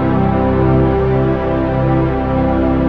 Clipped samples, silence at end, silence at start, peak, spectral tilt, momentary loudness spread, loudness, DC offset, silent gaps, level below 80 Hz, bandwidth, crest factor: under 0.1%; 0 s; 0 s; 0 dBFS; -10.5 dB/octave; 3 LU; -14 LUFS; under 0.1%; none; -24 dBFS; 5.2 kHz; 12 dB